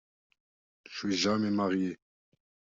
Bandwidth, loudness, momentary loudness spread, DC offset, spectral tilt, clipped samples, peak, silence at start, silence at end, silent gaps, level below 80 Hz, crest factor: 7.6 kHz; -30 LUFS; 14 LU; under 0.1%; -5 dB/octave; under 0.1%; -16 dBFS; 0.9 s; 0.85 s; none; -72 dBFS; 18 dB